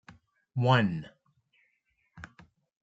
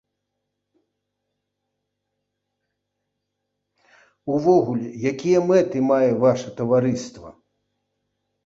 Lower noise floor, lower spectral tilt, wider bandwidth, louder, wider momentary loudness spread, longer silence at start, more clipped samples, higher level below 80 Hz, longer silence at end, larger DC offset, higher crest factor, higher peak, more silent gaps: second, -75 dBFS vs -79 dBFS; about the same, -7.5 dB/octave vs -7 dB/octave; about the same, 7.8 kHz vs 7.8 kHz; second, -28 LUFS vs -20 LUFS; first, 25 LU vs 9 LU; second, 0.55 s vs 4.25 s; neither; about the same, -66 dBFS vs -62 dBFS; second, 0.6 s vs 1.15 s; neither; first, 24 dB vs 18 dB; about the same, -8 dBFS vs -6 dBFS; neither